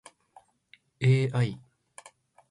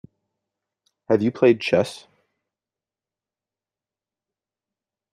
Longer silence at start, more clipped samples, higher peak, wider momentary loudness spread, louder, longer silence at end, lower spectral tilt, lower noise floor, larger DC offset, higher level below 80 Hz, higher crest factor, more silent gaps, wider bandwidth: about the same, 1 s vs 1.1 s; neither; second, -12 dBFS vs -4 dBFS; first, 26 LU vs 11 LU; second, -27 LUFS vs -20 LUFS; second, 0.95 s vs 3.15 s; about the same, -7 dB/octave vs -6.5 dB/octave; second, -62 dBFS vs under -90 dBFS; neither; about the same, -64 dBFS vs -68 dBFS; about the same, 18 dB vs 22 dB; neither; about the same, 11 kHz vs 12 kHz